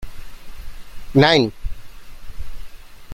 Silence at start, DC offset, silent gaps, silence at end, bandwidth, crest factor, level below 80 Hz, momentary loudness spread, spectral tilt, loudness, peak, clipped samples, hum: 0 s; under 0.1%; none; 0 s; 15.5 kHz; 20 dB; -34 dBFS; 28 LU; -6 dB/octave; -16 LUFS; -2 dBFS; under 0.1%; none